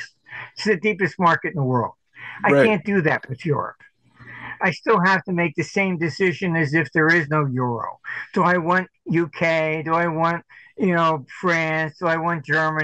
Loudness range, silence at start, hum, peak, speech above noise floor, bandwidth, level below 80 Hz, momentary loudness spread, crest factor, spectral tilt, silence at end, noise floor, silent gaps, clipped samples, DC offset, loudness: 2 LU; 0 s; none; -4 dBFS; 22 dB; 9 kHz; -62 dBFS; 13 LU; 16 dB; -6.5 dB/octave; 0 s; -43 dBFS; none; under 0.1%; under 0.1%; -21 LUFS